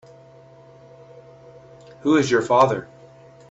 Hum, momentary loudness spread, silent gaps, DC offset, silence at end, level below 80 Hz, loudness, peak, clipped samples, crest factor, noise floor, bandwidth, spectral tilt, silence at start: none; 11 LU; none; under 0.1%; 0.65 s; -62 dBFS; -19 LUFS; -2 dBFS; under 0.1%; 22 dB; -48 dBFS; 8 kHz; -5.5 dB/octave; 2.05 s